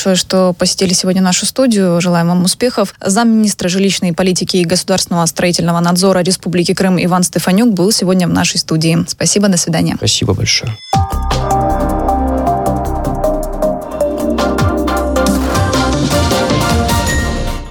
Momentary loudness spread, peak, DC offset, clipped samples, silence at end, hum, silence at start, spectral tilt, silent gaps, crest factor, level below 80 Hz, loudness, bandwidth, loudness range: 5 LU; 0 dBFS; under 0.1%; under 0.1%; 0 s; none; 0 s; -4.5 dB/octave; none; 12 dB; -26 dBFS; -13 LUFS; 19 kHz; 3 LU